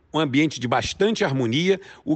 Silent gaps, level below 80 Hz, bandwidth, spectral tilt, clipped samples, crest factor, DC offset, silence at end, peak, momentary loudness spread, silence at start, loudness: none; -52 dBFS; 8.8 kHz; -5 dB/octave; under 0.1%; 14 dB; under 0.1%; 0 s; -8 dBFS; 3 LU; 0.15 s; -22 LUFS